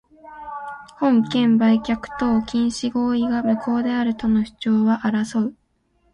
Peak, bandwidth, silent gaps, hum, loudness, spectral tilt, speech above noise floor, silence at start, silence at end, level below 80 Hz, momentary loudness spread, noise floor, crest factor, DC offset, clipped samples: -6 dBFS; 10.5 kHz; none; none; -20 LUFS; -6 dB/octave; 45 dB; 0.25 s; 0.6 s; -50 dBFS; 14 LU; -64 dBFS; 14 dB; under 0.1%; under 0.1%